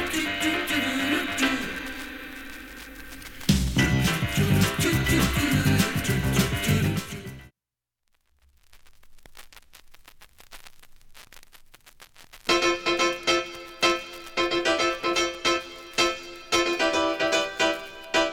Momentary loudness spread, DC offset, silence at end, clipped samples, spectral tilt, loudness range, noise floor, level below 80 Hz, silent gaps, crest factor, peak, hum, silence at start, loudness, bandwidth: 15 LU; under 0.1%; 0 s; under 0.1%; -4 dB/octave; 7 LU; -89 dBFS; -42 dBFS; none; 20 dB; -6 dBFS; none; 0 s; -24 LUFS; 17.5 kHz